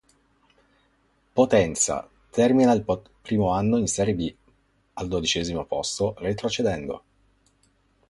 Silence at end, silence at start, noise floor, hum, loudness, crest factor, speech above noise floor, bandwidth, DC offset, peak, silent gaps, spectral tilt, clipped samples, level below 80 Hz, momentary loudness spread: 1.1 s; 1.35 s; -65 dBFS; none; -24 LUFS; 20 dB; 42 dB; 11.5 kHz; under 0.1%; -6 dBFS; none; -4.5 dB/octave; under 0.1%; -48 dBFS; 12 LU